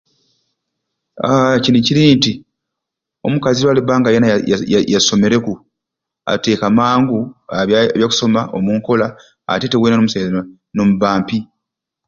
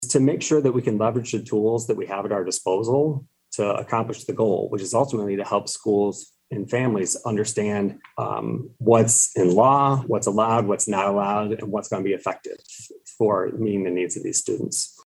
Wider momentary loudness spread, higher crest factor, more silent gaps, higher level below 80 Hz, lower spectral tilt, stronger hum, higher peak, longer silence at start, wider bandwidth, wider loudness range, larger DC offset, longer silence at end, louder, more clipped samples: about the same, 11 LU vs 11 LU; second, 14 dB vs 20 dB; neither; first, -50 dBFS vs -66 dBFS; about the same, -5 dB/octave vs -5 dB/octave; neither; about the same, 0 dBFS vs -2 dBFS; first, 1.15 s vs 0 s; second, 7.6 kHz vs 12.5 kHz; second, 2 LU vs 6 LU; neither; first, 0.65 s vs 0.15 s; first, -14 LUFS vs -22 LUFS; neither